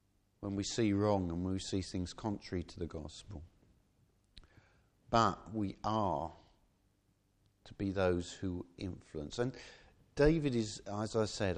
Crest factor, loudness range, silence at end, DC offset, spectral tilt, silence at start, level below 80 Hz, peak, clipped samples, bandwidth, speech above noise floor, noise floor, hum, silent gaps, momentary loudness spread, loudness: 24 dB; 5 LU; 0 s; under 0.1%; -6 dB/octave; 0.4 s; -54 dBFS; -14 dBFS; under 0.1%; 10 kHz; 39 dB; -75 dBFS; none; none; 15 LU; -36 LUFS